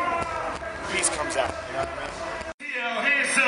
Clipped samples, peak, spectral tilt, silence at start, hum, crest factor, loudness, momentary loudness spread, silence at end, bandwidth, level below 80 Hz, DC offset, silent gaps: under 0.1%; -6 dBFS; -2 dB/octave; 0 s; none; 20 dB; -26 LUFS; 11 LU; 0 s; 11 kHz; -50 dBFS; under 0.1%; 2.54-2.58 s